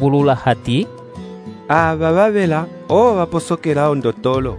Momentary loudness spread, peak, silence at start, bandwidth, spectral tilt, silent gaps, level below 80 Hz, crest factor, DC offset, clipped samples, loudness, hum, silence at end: 18 LU; 0 dBFS; 0 s; 11 kHz; -7 dB/octave; none; -42 dBFS; 16 dB; under 0.1%; under 0.1%; -16 LUFS; none; 0 s